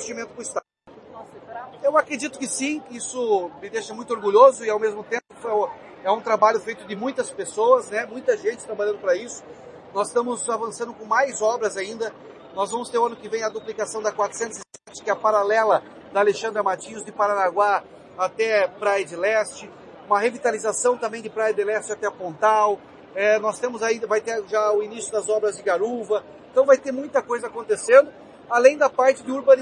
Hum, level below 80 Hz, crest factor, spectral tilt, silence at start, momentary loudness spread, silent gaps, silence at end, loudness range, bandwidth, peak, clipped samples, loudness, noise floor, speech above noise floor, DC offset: none; -72 dBFS; 20 dB; -3 dB/octave; 0 s; 13 LU; none; 0 s; 5 LU; 11 kHz; -2 dBFS; under 0.1%; -22 LUFS; -47 dBFS; 26 dB; under 0.1%